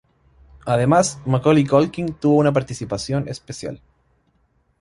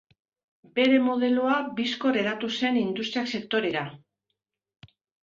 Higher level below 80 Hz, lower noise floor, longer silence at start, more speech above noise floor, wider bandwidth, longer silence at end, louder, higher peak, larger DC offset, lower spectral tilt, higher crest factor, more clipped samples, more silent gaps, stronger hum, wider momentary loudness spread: first, -50 dBFS vs -70 dBFS; second, -63 dBFS vs -82 dBFS; about the same, 0.65 s vs 0.75 s; second, 45 dB vs 57 dB; first, 11.5 kHz vs 7.4 kHz; second, 1.05 s vs 1.25 s; first, -19 LUFS vs -25 LUFS; first, -2 dBFS vs -8 dBFS; neither; about the same, -6 dB/octave vs -5 dB/octave; about the same, 18 dB vs 18 dB; neither; neither; neither; first, 15 LU vs 8 LU